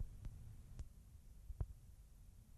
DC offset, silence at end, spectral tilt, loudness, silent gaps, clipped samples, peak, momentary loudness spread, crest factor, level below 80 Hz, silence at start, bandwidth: under 0.1%; 0 s; -7 dB/octave; -57 LUFS; none; under 0.1%; -30 dBFS; 13 LU; 22 dB; -54 dBFS; 0 s; 13.5 kHz